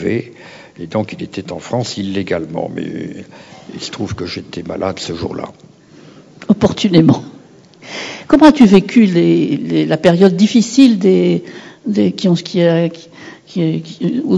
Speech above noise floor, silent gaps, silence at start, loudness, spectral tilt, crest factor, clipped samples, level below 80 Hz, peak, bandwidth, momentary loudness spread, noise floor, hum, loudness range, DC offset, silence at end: 28 dB; none; 0 s; -14 LUFS; -6.5 dB/octave; 14 dB; 0.7%; -46 dBFS; 0 dBFS; 9 kHz; 18 LU; -41 dBFS; none; 13 LU; under 0.1%; 0 s